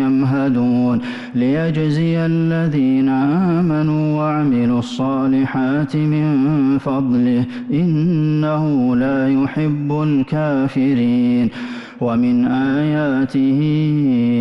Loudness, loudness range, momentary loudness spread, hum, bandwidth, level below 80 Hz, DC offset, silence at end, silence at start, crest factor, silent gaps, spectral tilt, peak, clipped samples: -17 LUFS; 1 LU; 3 LU; none; 7.4 kHz; -50 dBFS; under 0.1%; 0 s; 0 s; 6 dB; none; -9 dB/octave; -10 dBFS; under 0.1%